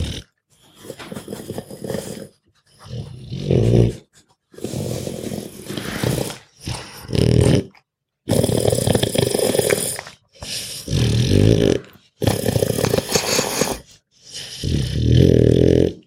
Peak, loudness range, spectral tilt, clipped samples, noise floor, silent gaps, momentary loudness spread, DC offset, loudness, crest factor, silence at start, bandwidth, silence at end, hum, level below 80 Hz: -2 dBFS; 6 LU; -5.5 dB/octave; under 0.1%; -60 dBFS; none; 19 LU; under 0.1%; -19 LUFS; 18 dB; 0 s; 16.5 kHz; 0.05 s; none; -36 dBFS